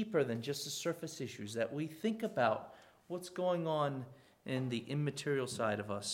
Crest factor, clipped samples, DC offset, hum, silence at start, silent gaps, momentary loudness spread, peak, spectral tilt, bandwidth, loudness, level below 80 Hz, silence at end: 20 dB; under 0.1%; under 0.1%; none; 0 s; none; 10 LU; -16 dBFS; -5 dB/octave; 17 kHz; -38 LUFS; -78 dBFS; 0 s